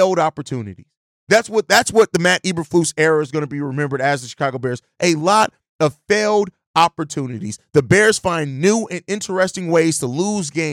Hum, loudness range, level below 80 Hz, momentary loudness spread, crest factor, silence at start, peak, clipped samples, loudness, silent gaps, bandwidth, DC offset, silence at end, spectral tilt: none; 2 LU; -56 dBFS; 10 LU; 14 dB; 0 s; -2 dBFS; under 0.1%; -18 LUFS; 0.97-1.27 s, 5.69-5.79 s, 6.67-6.74 s; 17 kHz; under 0.1%; 0 s; -4.5 dB/octave